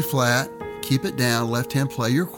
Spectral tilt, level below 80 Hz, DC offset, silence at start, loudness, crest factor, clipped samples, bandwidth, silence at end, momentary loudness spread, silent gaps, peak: -5 dB/octave; -56 dBFS; under 0.1%; 0 s; -23 LUFS; 16 dB; under 0.1%; 19 kHz; 0 s; 5 LU; none; -6 dBFS